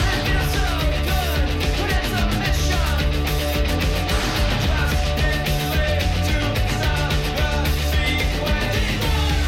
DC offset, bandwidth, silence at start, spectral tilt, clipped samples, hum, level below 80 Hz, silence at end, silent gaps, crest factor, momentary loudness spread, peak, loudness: under 0.1%; 16.5 kHz; 0 s; -4.5 dB/octave; under 0.1%; none; -22 dBFS; 0 s; none; 10 dB; 1 LU; -10 dBFS; -21 LUFS